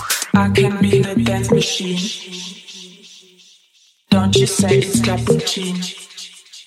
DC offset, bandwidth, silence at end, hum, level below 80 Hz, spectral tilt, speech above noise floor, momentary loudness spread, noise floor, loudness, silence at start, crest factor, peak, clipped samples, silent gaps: under 0.1%; 16.5 kHz; 0.05 s; none; -44 dBFS; -4.5 dB/octave; 38 dB; 19 LU; -55 dBFS; -16 LUFS; 0 s; 16 dB; 0 dBFS; under 0.1%; none